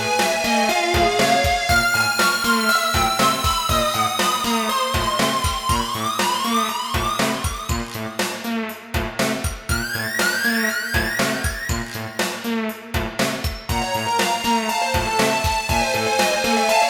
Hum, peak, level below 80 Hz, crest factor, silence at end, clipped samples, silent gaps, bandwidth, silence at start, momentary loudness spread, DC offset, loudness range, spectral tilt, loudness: none; -4 dBFS; -34 dBFS; 16 dB; 0 s; under 0.1%; none; 19 kHz; 0 s; 8 LU; under 0.1%; 6 LU; -3 dB/octave; -20 LUFS